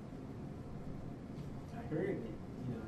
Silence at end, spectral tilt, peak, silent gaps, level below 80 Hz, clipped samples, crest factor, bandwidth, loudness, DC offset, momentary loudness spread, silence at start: 0 s; -8.5 dB/octave; -26 dBFS; none; -56 dBFS; under 0.1%; 18 dB; 13 kHz; -45 LUFS; under 0.1%; 9 LU; 0 s